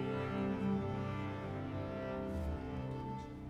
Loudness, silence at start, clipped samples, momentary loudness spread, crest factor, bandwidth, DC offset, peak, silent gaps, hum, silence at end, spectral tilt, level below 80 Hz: -40 LUFS; 0 s; under 0.1%; 6 LU; 14 dB; 10.5 kHz; under 0.1%; -26 dBFS; none; none; 0 s; -8.5 dB/octave; -52 dBFS